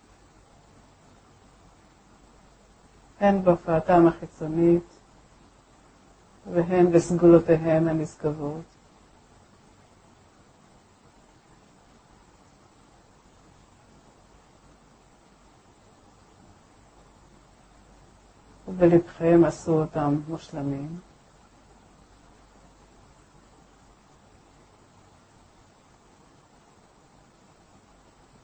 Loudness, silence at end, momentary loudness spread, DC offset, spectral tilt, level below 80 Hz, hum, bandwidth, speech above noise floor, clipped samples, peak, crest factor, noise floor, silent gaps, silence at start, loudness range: -22 LUFS; 7.45 s; 16 LU; under 0.1%; -8 dB/octave; -54 dBFS; none; 8.6 kHz; 35 dB; under 0.1%; -4 dBFS; 24 dB; -57 dBFS; none; 3.2 s; 13 LU